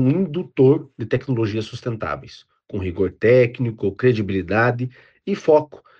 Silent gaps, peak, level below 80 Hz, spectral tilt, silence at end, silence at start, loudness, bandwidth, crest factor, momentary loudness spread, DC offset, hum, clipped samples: none; -4 dBFS; -52 dBFS; -8.5 dB/octave; 0.25 s; 0 s; -20 LUFS; 7.2 kHz; 16 dB; 12 LU; under 0.1%; none; under 0.1%